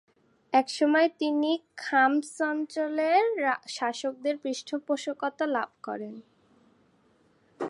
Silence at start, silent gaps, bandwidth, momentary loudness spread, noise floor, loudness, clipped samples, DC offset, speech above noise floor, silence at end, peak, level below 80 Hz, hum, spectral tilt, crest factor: 0.5 s; none; 11.5 kHz; 11 LU; -65 dBFS; -28 LUFS; under 0.1%; under 0.1%; 37 dB; 0 s; -10 dBFS; -84 dBFS; none; -3 dB/octave; 18 dB